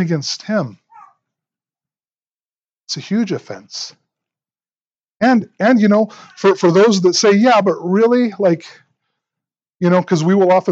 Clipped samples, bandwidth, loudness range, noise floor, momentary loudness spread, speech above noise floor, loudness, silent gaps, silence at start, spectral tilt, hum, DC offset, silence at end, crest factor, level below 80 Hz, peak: under 0.1%; 8 kHz; 13 LU; under -90 dBFS; 15 LU; over 76 dB; -14 LUFS; 2.28-2.49 s, 2.55-2.59 s, 9.75-9.79 s; 0 s; -5.5 dB/octave; none; under 0.1%; 0 s; 16 dB; -72 dBFS; 0 dBFS